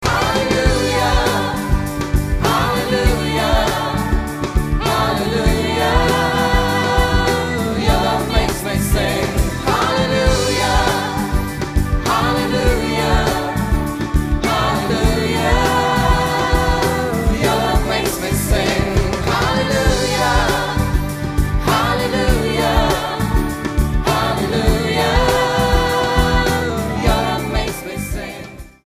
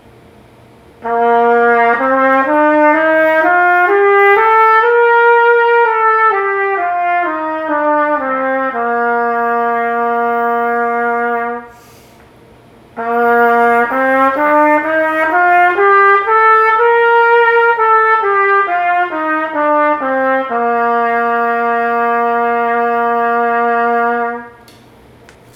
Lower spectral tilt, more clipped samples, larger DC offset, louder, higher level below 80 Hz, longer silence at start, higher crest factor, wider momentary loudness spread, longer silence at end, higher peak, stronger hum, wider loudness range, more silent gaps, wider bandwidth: about the same, -5 dB/octave vs -5.5 dB/octave; neither; neither; second, -17 LUFS vs -11 LUFS; first, -22 dBFS vs -56 dBFS; second, 0 s vs 1 s; about the same, 16 dB vs 12 dB; about the same, 5 LU vs 7 LU; second, 0.2 s vs 1.05 s; about the same, 0 dBFS vs 0 dBFS; neither; second, 1 LU vs 6 LU; neither; about the same, 15.5 kHz vs 16 kHz